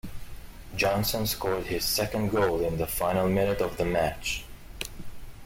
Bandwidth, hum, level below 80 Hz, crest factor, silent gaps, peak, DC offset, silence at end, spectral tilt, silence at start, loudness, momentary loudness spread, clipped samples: 16.5 kHz; none; -42 dBFS; 16 dB; none; -12 dBFS; under 0.1%; 0 s; -4.5 dB/octave; 0.05 s; -28 LUFS; 21 LU; under 0.1%